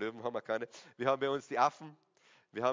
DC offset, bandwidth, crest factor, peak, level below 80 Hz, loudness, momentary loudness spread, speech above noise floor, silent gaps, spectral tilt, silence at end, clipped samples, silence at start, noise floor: under 0.1%; 7.6 kHz; 22 dB; -14 dBFS; -80 dBFS; -35 LUFS; 15 LU; 17 dB; none; -5 dB/octave; 0 s; under 0.1%; 0 s; -52 dBFS